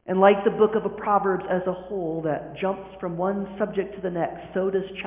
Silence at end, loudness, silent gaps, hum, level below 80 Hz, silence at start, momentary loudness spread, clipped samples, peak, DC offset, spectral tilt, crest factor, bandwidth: 0 s; -25 LUFS; none; none; -56 dBFS; 0.05 s; 10 LU; under 0.1%; -4 dBFS; under 0.1%; -10.5 dB/octave; 20 dB; 3.7 kHz